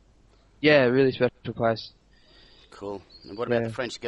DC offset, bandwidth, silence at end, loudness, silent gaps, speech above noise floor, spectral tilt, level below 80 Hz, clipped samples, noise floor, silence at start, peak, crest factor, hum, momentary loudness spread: under 0.1%; 11.5 kHz; 0 s; -24 LUFS; none; 34 dB; -6.5 dB/octave; -60 dBFS; under 0.1%; -58 dBFS; 0.6 s; -6 dBFS; 20 dB; none; 21 LU